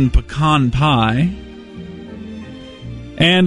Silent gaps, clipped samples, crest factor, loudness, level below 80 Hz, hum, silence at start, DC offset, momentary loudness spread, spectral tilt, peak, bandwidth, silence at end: none; under 0.1%; 16 dB; -15 LUFS; -28 dBFS; none; 0 s; under 0.1%; 19 LU; -6.5 dB/octave; -2 dBFS; 11 kHz; 0 s